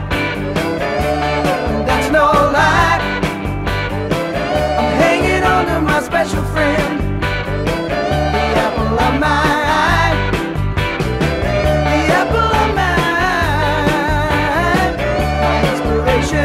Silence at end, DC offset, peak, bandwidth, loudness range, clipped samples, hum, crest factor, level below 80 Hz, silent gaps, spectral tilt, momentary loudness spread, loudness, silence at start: 0 s; under 0.1%; 0 dBFS; 16 kHz; 1 LU; under 0.1%; none; 14 dB; -26 dBFS; none; -5.5 dB/octave; 6 LU; -15 LUFS; 0 s